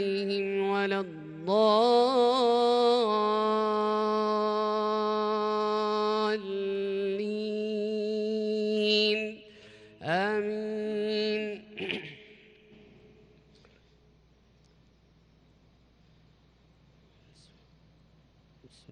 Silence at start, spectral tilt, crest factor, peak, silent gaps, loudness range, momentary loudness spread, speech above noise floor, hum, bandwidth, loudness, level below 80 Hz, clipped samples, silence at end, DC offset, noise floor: 0 s; -5.5 dB/octave; 16 dB; -12 dBFS; none; 10 LU; 10 LU; 37 dB; none; 10 kHz; -28 LUFS; -70 dBFS; under 0.1%; 6.7 s; under 0.1%; -62 dBFS